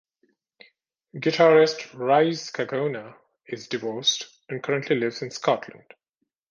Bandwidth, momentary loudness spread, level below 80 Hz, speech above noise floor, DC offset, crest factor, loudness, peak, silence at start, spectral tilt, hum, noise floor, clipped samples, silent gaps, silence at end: 7.4 kHz; 18 LU; -74 dBFS; 56 dB; under 0.1%; 20 dB; -23 LUFS; -6 dBFS; 1.15 s; -4 dB/octave; none; -79 dBFS; under 0.1%; none; 0.75 s